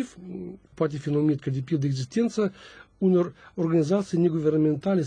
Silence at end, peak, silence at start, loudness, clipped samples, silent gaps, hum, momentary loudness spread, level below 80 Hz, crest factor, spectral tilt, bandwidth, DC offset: 0 s; -12 dBFS; 0 s; -25 LUFS; under 0.1%; none; none; 11 LU; -62 dBFS; 14 dB; -8 dB/octave; 10 kHz; under 0.1%